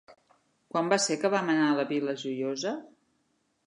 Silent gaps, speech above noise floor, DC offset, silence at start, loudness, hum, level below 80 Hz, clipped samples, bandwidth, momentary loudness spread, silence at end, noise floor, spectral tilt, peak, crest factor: none; 46 dB; under 0.1%; 0.1 s; -28 LUFS; none; -82 dBFS; under 0.1%; 11 kHz; 8 LU; 0.8 s; -74 dBFS; -4 dB/octave; -8 dBFS; 22 dB